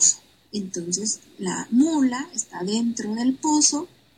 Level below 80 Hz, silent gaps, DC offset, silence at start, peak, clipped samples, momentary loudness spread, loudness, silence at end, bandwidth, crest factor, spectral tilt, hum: -68 dBFS; none; under 0.1%; 0 s; -4 dBFS; under 0.1%; 12 LU; -23 LUFS; 0.3 s; 11.5 kHz; 18 dB; -2.5 dB/octave; none